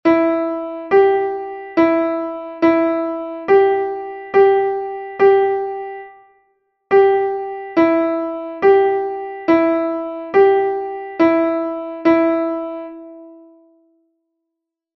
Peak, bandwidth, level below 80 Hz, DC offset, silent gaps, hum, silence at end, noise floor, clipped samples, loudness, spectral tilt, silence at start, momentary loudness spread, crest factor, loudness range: -2 dBFS; 5.8 kHz; -58 dBFS; under 0.1%; none; none; 1.6 s; -80 dBFS; under 0.1%; -17 LUFS; -7.5 dB/octave; 0.05 s; 12 LU; 16 dB; 3 LU